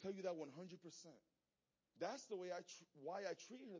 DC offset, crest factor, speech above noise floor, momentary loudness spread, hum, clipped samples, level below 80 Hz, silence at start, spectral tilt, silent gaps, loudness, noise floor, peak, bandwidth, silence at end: under 0.1%; 18 dB; over 38 dB; 11 LU; none; under 0.1%; under -90 dBFS; 0 s; -4.5 dB/octave; none; -52 LUFS; under -90 dBFS; -34 dBFS; 7.6 kHz; 0 s